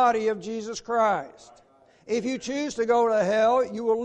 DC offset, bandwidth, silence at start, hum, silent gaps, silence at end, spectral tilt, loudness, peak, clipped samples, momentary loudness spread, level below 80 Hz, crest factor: under 0.1%; 9.2 kHz; 0 s; none; none; 0 s; -4.5 dB/octave; -25 LUFS; -10 dBFS; under 0.1%; 10 LU; -64 dBFS; 14 dB